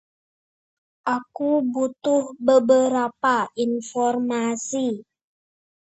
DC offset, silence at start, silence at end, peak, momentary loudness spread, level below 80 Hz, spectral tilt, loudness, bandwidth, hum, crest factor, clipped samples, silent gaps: under 0.1%; 1.05 s; 0.95 s; -4 dBFS; 8 LU; -72 dBFS; -4 dB/octave; -22 LUFS; 8.2 kHz; none; 18 dB; under 0.1%; none